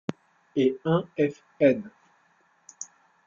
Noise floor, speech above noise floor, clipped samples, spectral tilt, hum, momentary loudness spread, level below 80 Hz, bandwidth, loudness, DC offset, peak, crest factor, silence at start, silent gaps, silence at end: -65 dBFS; 40 dB; under 0.1%; -6.5 dB/octave; none; 19 LU; -68 dBFS; 7.6 kHz; -26 LUFS; under 0.1%; -6 dBFS; 22 dB; 0.1 s; none; 0.45 s